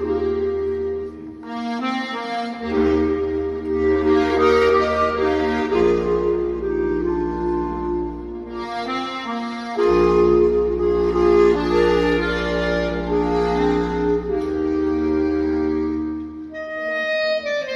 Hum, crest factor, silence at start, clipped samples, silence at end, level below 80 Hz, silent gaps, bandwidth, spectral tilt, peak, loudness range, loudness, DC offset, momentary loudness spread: none; 14 dB; 0 s; under 0.1%; 0 s; -36 dBFS; none; 7.8 kHz; -6.5 dB/octave; -6 dBFS; 6 LU; -20 LUFS; under 0.1%; 11 LU